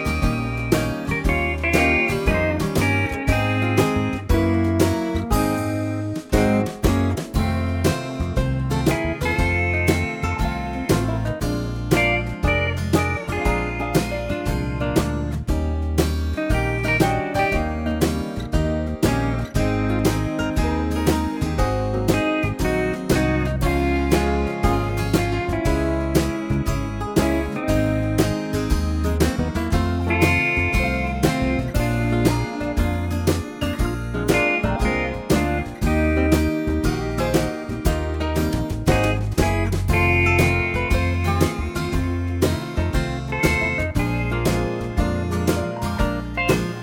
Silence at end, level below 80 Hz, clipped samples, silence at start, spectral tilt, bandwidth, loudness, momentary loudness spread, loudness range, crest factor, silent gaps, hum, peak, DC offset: 0 s; -28 dBFS; under 0.1%; 0 s; -6 dB/octave; 19 kHz; -21 LUFS; 5 LU; 2 LU; 18 dB; none; none; -4 dBFS; under 0.1%